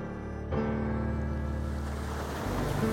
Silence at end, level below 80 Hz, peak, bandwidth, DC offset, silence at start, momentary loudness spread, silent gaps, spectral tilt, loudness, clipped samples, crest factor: 0 s; -38 dBFS; -18 dBFS; 17 kHz; under 0.1%; 0 s; 4 LU; none; -7 dB/octave; -33 LUFS; under 0.1%; 14 dB